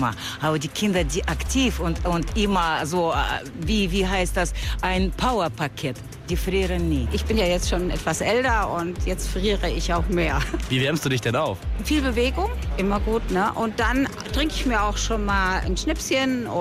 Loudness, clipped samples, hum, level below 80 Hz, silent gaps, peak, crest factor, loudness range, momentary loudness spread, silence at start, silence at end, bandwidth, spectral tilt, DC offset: -23 LUFS; under 0.1%; none; -30 dBFS; none; -10 dBFS; 12 dB; 1 LU; 5 LU; 0 s; 0 s; 15.5 kHz; -4.5 dB/octave; under 0.1%